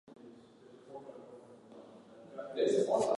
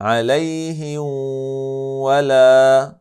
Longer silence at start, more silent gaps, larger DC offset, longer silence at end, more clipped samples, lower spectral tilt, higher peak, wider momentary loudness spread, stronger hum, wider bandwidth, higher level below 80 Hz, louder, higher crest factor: about the same, 0.1 s vs 0 s; neither; neither; about the same, 0.05 s vs 0.1 s; neither; about the same, -5 dB/octave vs -5.5 dB/octave; second, -18 dBFS vs -2 dBFS; first, 26 LU vs 14 LU; neither; second, 11.5 kHz vs 13 kHz; second, -80 dBFS vs -70 dBFS; second, -33 LUFS vs -16 LUFS; first, 20 dB vs 14 dB